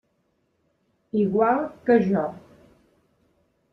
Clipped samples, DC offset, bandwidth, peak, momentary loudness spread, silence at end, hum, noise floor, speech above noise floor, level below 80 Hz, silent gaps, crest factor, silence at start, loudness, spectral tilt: under 0.1%; under 0.1%; 6 kHz; -6 dBFS; 8 LU; 1.35 s; none; -70 dBFS; 49 dB; -64 dBFS; none; 20 dB; 1.15 s; -23 LUFS; -9.5 dB/octave